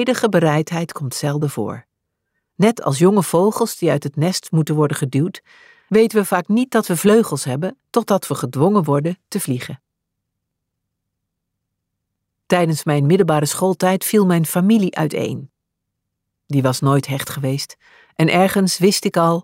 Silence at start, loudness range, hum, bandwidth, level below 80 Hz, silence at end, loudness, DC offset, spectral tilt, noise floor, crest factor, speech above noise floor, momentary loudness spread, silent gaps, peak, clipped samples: 0 s; 6 LU; none; 16 kHz; -62 dBFS; 0 s; -18 LUFS; under 0.1%; -5.5 dB/octave; -78 dBFS; 16 dB; 61 dB; 9 LU; none; -2 dBFS; under 0.1%